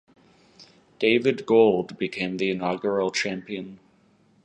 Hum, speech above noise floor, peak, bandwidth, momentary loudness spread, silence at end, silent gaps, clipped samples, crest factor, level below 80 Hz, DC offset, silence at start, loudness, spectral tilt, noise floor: none; 37 dB; -4 dBFS; 9 kHz; 14 LU; 0.7 s; none; under 0.1%; 20 dB; -66 dBFS; under 0.1%; 0.6 s; -23 LUFS; -5 dB/octave; -61 dBFS